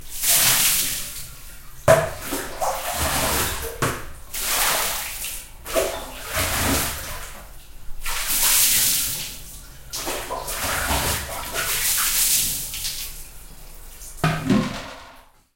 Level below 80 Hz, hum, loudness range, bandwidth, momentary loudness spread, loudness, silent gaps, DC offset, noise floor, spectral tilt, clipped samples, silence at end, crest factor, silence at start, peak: -38 dBFS; none; 4 LU; 16.5 kHz; 19 LU; -21 LUFS; none; under 0.1%; -48 dBFS; -2 dB/octave; under 0.1%; 0.35 s; 24 dB; 0 s; 0 dBFS